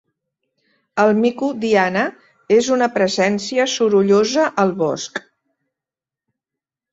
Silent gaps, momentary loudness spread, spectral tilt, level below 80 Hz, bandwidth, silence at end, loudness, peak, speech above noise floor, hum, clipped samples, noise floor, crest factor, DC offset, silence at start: none; 9 LU; -4.5 dB/octave; -62 dBFS; 8 kHz; 1.7 s; -17 LUFS; -2 dBFS; 72 dB; none; under 0.1%; -88 dBFS; 18 dB; under 0.1%; 0.95 s